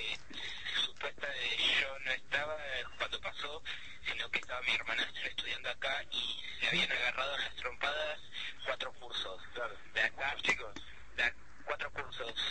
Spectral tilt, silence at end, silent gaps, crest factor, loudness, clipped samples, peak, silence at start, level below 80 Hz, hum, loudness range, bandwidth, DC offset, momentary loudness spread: -1.5 dB/octave; 0 s; none; 22 dB; -36 LUFS; under 0.1%; -16 dBFS; 0 s; -62 dBFS; none; 3 LU; 8.8 kHz; 0.5%; 11 LU